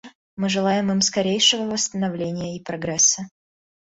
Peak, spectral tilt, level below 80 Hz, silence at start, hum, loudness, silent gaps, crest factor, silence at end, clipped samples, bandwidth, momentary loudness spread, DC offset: -4 dBFS; -2.5 dB/octave; -60 dBFS; 0.05 s; none; -20 LUFS; 0.15-0.37 s; 20 dB; 0.6 s; under 0.1%; 8.2 kHz; 12 LU; under 0.1%